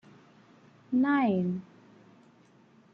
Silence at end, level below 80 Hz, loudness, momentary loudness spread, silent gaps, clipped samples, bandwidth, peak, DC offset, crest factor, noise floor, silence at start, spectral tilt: 1.35 s; -76 dBFS; -28 LUFS; 9 LU; none; under 0.1%; 5.4 kHz; -16 dBFS; under 0.1%; 16 dB; -60 dBFS; 0.9 s; -9 dB/octave